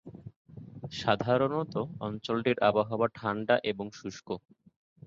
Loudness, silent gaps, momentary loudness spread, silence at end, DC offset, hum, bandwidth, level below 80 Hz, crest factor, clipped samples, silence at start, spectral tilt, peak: -30 LUFS; 0.36-0.45 s; 21 LU; 0.7 s; under 0.1%; none; 7.6 kHz; -64 dBFS; 20 dB; under 0.1%; 0.05 s; -6 dB/octave; -10 dBFS